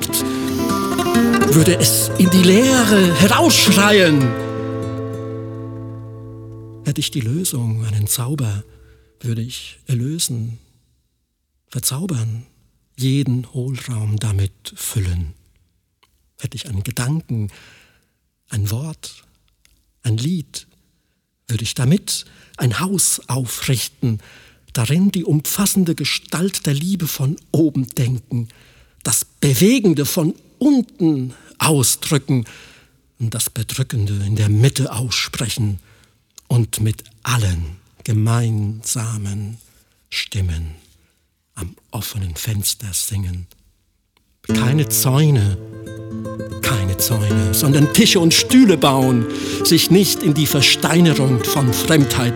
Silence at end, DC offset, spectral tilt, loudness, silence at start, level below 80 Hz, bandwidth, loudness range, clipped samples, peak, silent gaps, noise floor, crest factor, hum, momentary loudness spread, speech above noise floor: 0 s; under 0.1%; -4.5 dB/octave; -17 LUFS; 0 s; -44 dBFS; 19.5 kHz; 13 LU; under 0.1%; 0 dBFS; none; -69 dBFS; 18 dB; none; 17 LU; 52 dB